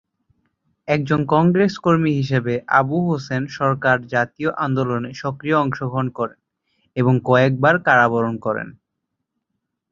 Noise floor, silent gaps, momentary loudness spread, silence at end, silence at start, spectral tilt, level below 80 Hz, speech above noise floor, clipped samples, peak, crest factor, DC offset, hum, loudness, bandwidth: -78 dBFS; none; 11 LU; 1.2 s; 0.85 s; -7.5 dB/octave; -56 dBFS; 60 dB; under 0.1%; -2 dBFS; 18 dB; under 0.1%; none; -19 LUFS; 7.4 kHz